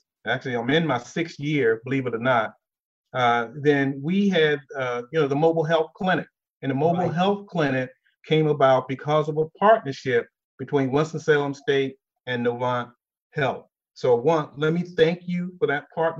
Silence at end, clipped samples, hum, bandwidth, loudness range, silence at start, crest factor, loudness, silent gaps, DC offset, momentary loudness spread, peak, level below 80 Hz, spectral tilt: 0 s; under 0.1%; none; 7.6 kHz; 3 LU; 0.25 s; 18 dB; -23 LUFS; 2.85-3.04 s, 6.50-6.60 s, 10.44-10.58 s, 13.22-13.30 s; under 0.1%; 9 LU; -6 dBFS; -66 dBFS; -6.5 dB/octave